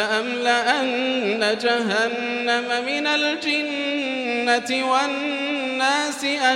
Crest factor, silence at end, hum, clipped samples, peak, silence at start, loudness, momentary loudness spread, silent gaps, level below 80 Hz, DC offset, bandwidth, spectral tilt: 16 dB; 0 s; none; under 0.1%; -6 dBFS; 0 s; -21 LUFS; 4 LU; none; -72 dBFS; under 0.1%; 14.5 kHz; -2.5 dB/octave